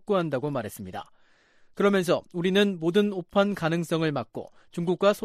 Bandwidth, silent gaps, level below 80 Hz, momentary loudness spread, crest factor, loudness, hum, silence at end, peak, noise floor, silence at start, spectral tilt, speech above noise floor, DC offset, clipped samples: 15 kHz; none; -64 dBFS; 15 LU; 18 dB; -26 LUFS; none; 0 s; -8 dBFS; -58 dBFS; 0.1 s; -6 dB/octave; 33 dB; under 0.1%; under 0.1%